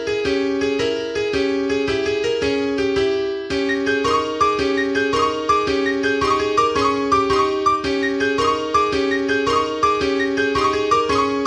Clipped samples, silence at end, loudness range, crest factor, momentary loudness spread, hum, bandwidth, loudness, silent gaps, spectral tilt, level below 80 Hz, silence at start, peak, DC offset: under 0.1%; 0 s; 2 LU; 14 dB; 3 LU; none; 10.5 kHz; -19 LUFS; none; -4 dB/octave; -44 dBFS; 0 s; -4 dBFS; under 0.1%